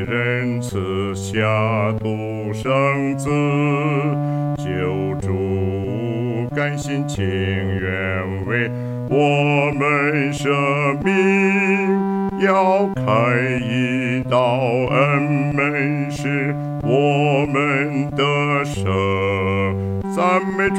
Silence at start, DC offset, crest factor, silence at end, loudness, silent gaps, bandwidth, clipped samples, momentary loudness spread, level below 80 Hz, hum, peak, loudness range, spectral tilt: 0 s; under 0.1%; 14 dB; 0 s; -19 LUFS; none; 12.5 kHz; under 0.1%; 7 LU; -48 dBFS; none; -4 dBFS; 5 LU; -6.5 dB/octave